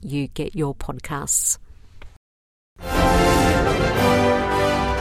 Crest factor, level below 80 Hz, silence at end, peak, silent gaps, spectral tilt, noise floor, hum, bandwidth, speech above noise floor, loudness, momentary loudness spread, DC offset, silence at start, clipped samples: 16 dB; -32 dBFS; 0 s; -6 dBFS; 2.17-2.76 s; -4 dB/octave; -40 dBFS; none; 16.5 kHz; 16 dB; -20 LUFS; 11 LU; under 0.1%; 0 s; under 0.1%